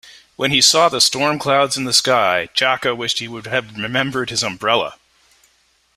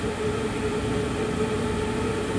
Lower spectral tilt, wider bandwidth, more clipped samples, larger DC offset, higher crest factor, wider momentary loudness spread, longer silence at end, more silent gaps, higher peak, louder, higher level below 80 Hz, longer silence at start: second, -2 dB/octave vs -5.5 dB/octave; first, 16 kHz vs 11 kHz; neither; neither; first, 18 dB vs 12 dB; first, 10 LU vs 1 LU; first, 1.05 s vs 0 s; neither; first, 0 dBFS vs -14 dBFS; first, -16 LUFS vs -27 LUFS; second, -58 dBFS vs -40 dBFS; about the same, 0.05 s vs 0 s